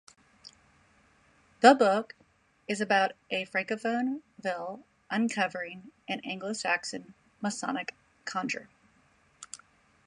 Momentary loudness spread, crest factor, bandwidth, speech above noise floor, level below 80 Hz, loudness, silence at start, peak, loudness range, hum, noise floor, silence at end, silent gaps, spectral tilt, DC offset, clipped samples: 22 LU; 26 dB; 11.5 kHz; 37 dB; -76 dBFS; -29 LUFS; 0.45 s; -4 dBFS; 8 LU; none; -66 dBFS; 0.5 s; none; -3.5 dB/octave; under 0.1%; under 0.1%